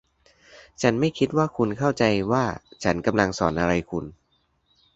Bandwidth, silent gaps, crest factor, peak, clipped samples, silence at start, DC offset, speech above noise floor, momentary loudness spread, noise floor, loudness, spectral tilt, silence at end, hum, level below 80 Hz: 8.2 kHz; none; 22 dB; -2 dBFS; under 0.1%; 0.55 s; under 0.1%; 45 dB; 7 LU; -68 dBFS; -24 LUFS; -6 dB/octave; 0.85 s; none; -48 dBFS